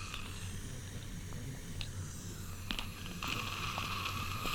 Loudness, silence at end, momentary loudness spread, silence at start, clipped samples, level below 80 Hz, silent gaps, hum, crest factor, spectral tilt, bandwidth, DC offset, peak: -41 LUFS; 0 s; 8 LU; 0 s; under 0.1%; -48 dBFS; none; none; 26 dB; -3.5 dB/octave; 19 kHz; under 0.1%; -16 dBFS